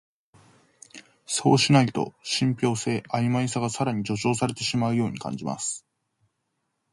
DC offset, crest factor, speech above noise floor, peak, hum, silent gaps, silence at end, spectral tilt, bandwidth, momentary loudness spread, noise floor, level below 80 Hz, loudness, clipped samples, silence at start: under 0.1%; 20 dB; 53 dB; -6 dBFS; none; none; 1.15 s; -5 dB/octave; 11.5 kHz; 11 LU; -77 dBFS; -62 dBFS; -25 LUFS; under 0.1%; 0.95 s